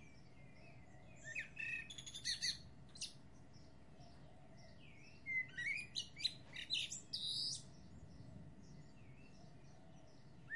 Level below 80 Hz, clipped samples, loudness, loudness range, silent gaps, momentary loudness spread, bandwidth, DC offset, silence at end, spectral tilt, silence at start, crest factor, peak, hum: -72 dBFS; under 0.1%; -44 LUFS; 5 LU; none; 22 LU; 12 kHz; under 0.1%; 0 s; -1 dB/octave; 0 s; 22 dB; -28 dBFS; none